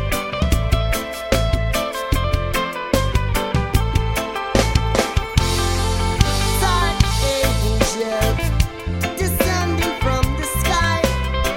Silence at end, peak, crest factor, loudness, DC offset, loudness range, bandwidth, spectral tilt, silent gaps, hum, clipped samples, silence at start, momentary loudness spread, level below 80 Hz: 0 s; 0 dBFS; 18 dB; -19 LUFS; under 0.1%; 2 LU; 17 kHz; -4.5 dB/octave; none; none; under 0.1%; 0 s; 4 LU; -24 dBFS